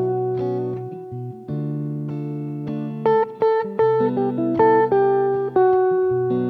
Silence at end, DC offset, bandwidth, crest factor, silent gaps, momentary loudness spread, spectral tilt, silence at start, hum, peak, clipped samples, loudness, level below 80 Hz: 0 s; under 0.1%; 4.7 kHz; 16 dB; none; 12 LU; -10.5 dB/octave; 0 s; none; -4 dBFS; under 0.1%; -20 LUFS; -62 dBFS